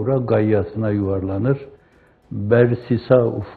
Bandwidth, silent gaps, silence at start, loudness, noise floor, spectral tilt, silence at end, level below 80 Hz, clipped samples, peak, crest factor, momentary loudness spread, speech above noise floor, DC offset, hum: 4.7 kHz; none; 0 s; -19 LUFS; -54 dBFS; -11.5 dB/octave; 0 s; -50 dBFS; under 0.1%; 0 dBFS; 18 dB; 7 LU; 35 dB; under 0.1%; none